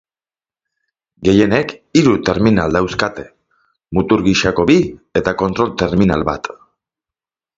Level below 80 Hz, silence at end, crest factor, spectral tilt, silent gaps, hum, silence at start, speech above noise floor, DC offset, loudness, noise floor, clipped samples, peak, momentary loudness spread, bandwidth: -38 dBFS; 1.05 s; 16 dB; -6 dB/octave; none; none; 1.2 s; over 76 dB; under 0.1%; -15 LUFS; under -90 dBFS; under 0.1%; 0 dBFS; 8 LU; 7.8 kHz